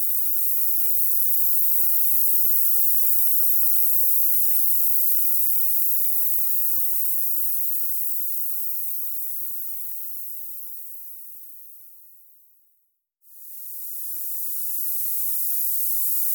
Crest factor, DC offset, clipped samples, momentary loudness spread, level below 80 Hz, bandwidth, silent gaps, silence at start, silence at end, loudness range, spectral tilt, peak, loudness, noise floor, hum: 16 dB; under 0.1%; under 0.1%; 15 LU; under -90 dBFS; 19.5 kHz; none; 0 s; 0 s; 18 LU; 10.5 dB/octave; -6 dBFS; -18 LUFS; -69 dBFS; none